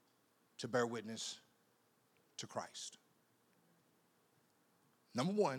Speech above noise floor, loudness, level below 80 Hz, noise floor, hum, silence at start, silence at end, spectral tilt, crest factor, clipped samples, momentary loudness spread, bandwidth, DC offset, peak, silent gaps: 36 dB; -43 LUFS; under -90 dBFS; -76 dBFS; none; 0.6 s; 0 s; -4.5 dB/octave; 22 dB; under 0.1%; 15 LU; 18.5 kHz; under 0.1%; -24 dBFS; none